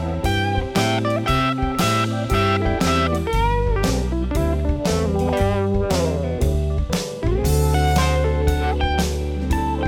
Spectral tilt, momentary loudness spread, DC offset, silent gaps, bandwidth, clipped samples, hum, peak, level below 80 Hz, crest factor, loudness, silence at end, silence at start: -5.5 dB/octave; 4 LU; under 0.1%; none; 17 kHz; under 0.1%; none; -4 dBFS; -24 dBFS; 16 dB; -20 LUFS; 0 s; 0 s